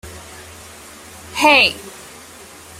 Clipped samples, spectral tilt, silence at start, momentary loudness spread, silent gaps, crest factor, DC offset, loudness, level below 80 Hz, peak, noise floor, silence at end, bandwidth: under 0.1%; -2 dB/octave; 0.05 s; 26 LU; none; 20 dB; under 0.1%; -12 LUFS; -52 dBFS; 0 dBFS; -40 dBFS; 0.9 s; 16 kHz